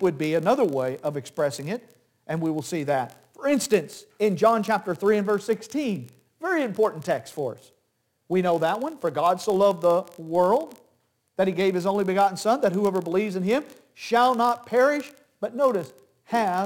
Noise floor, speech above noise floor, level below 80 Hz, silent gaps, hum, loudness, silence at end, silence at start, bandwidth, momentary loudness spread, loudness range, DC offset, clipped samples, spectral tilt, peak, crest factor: -72 dBFS; 49 dB; -72 dBFS; none; none; -24 LUFS; 0 s; 0 s; 17 kHz; 12 LU; 4 LU; under 0.1%; under 0.1%; -5.5 dB/octave; -8 dBFS; 16 dB